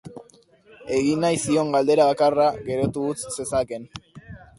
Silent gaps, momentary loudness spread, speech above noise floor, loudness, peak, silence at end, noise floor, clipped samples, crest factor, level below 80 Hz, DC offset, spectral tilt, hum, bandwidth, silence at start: none; 20 LU; 32 dB; -22 LUFS; -6 dBFS; 0.2 s; -54 dBFS; under 0.1%; 18 dB; -52 dBFS; under 0.1%; -5 dB/octave; none; 11.5 kHz; 0.05 s